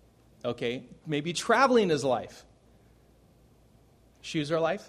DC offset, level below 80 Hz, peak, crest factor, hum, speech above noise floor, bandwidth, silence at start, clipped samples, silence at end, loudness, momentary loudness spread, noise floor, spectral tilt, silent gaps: under 0.1%; -64 dBFS; -8 dBFS; 22 dB; none; 33 dB; 13 kHz; 0.45 s; under 0.1%; 0 s; -28 LUFS; 16 LU; -60 dBFS; -4.5 dB/octave; none